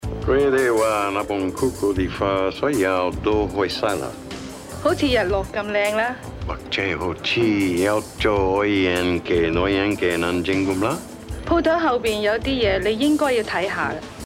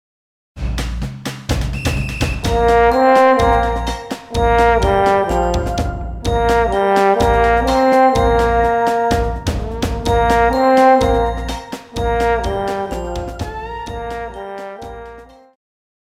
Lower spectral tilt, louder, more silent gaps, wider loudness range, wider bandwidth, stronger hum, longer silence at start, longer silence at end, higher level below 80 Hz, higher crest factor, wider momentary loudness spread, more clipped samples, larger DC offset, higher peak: about the same, -5 dB/octave vs -6 dB/octave; second, -21 LUFS vs -16 LUFS; neither; second, 2 LU vs 8 LU; about the same, 16 kHz vs 16 kHz; neither; second, 0 s vs 0.55 s; second, 0 s vs 0.8 s; second, -38 dBFS vs -26 dBFS; about the same, 14 dB vs 16 dB; second, 7 LU vs 15 LU; neither; neither; second, -6 dBFS vs 0 dBFS